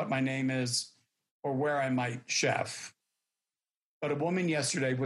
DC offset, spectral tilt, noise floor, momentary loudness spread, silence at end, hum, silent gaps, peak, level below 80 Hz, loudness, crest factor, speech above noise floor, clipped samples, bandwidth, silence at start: under 0.1%; -4 dB/octave; under -90 dBFS; 10 LU; 0 s; none; 1.31-1.43 s, 3.84-4.01 s; -16 dBFS; -76 dBFS; -31 LUFS; 16 dB; over 59 dB; under 0.1%; 12.5 kHz; 0 s